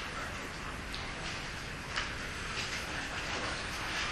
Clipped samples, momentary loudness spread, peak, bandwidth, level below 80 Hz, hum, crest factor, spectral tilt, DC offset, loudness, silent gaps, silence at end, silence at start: under 0.1%; 5 LU; -18 dBFS; 13 kHz; -48 dBFS; none; 20 dB; -2.5 dB/octave; under 0.1%; -37 LUFS; none; 0 s; 0 s